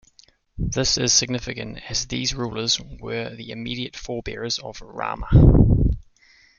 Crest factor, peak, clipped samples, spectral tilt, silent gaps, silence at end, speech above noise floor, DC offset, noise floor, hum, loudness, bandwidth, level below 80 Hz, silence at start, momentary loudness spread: 20 dB; -2 dBFS; under 0.1%; -4.5 dB/octave; none; 0.6 s; 35 dB; under 0.1%; -56 dBFS; none; -22 LUFS; 7.2 kHz; -28 dBFS; 0.55 s; 16 LU